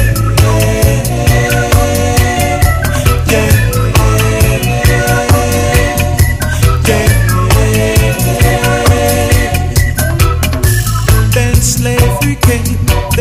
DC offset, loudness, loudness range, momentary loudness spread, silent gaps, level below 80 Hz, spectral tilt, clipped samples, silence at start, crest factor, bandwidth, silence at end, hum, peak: under 0.1%; -10 LUFS; 1 LU; 2 LU; none; -16 dBFS; -5 dB/octave; 0.1%; 0 s; 10 dB; 16.5 kHz; 0 s; none; 0 dBFS